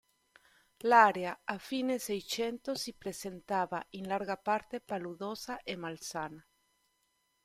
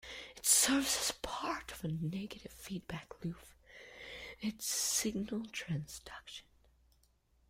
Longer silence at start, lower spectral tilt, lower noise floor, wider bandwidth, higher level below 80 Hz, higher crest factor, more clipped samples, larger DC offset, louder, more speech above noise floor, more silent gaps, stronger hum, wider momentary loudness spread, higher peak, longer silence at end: first, 0.85 s vs 0.05 s; about the same, -3.5 dB/octave vs -2.5 dB/octave; first, -77 dBFS vs -72 dBFS; about the same, 16 kHz vs 16.5 kHz; second, -72 dBFS vs -62 dBFS; about the same, 26 dB vs 26 dB; neither; neither; about the same, -34 LUFS vs -35 LUFS; first, 44 dB vs 35 dB; neither; neither; second, 14 LU vs 20 LU; first, -10 dBFS vs -14 dBFS; about the same, 1.05 s vs 1.1 s